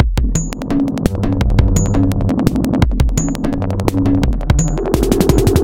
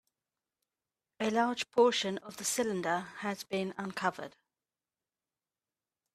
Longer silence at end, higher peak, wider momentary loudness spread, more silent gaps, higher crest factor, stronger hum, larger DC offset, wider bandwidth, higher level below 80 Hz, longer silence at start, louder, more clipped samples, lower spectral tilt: second, 0 s vs 1.85 s; first, 0 dBFS vs -14 dBFS; second, 5 LU vs 11 LU; neither; second, 14 dB vs 22 dB; neither; neither; first, 17 kHz vs 15 kHz; first, -18 dBFS vs -78 dBFS; second, 0 s vs 1.2 s; first, -16 LUFS vs -33 LUFS; neither; first, -6.5 dB/octave vs -3.5 dB/octave